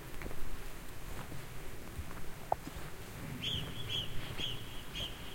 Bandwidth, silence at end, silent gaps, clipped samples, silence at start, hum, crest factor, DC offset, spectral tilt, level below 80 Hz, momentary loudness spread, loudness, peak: 16.5 kHz; 0 s; none; under 0.1%; 0 s; none; 22 dB; under 0.1%; -3.5 dB/octave; -48 dBFS; 10 LU; -42 LUFS; -16 dBFS